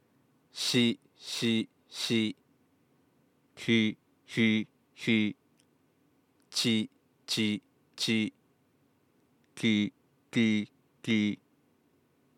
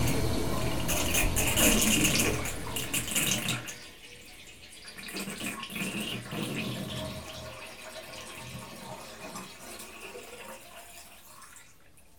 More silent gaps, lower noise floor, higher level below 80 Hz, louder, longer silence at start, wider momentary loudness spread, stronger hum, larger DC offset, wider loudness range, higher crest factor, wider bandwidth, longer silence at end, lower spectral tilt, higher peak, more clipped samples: neither; first, -70 dBFS vs -59 dBFS; second, -86 dBFS vs -44 dBFS; about the same, -30 LUFS vs -29 LUFS; first, 0.55 s vs 0 s; second, 16 LU vs 23 LU; neither; neither; second, 1 LU vs 17 LU; about the same, 20 dB vs 24 dB; second, 16 kHz vs 19.5 kHz; first, 1.05 s vs 0 s; about the same, -4 dB/octave vs -3 dB/octave; second, -14 dBFS vs -10 dBFS; neither